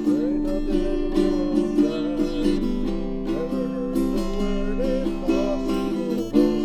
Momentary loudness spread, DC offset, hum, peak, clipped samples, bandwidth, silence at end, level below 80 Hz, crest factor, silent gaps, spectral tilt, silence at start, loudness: 4 LU; under 0.1%; none; -6 dBFS; under 0.1%; 13.5 kHz; 0 s; -30 dBFS; 16 dB; none; -7 dB/octave; 0 s; -24 LUFS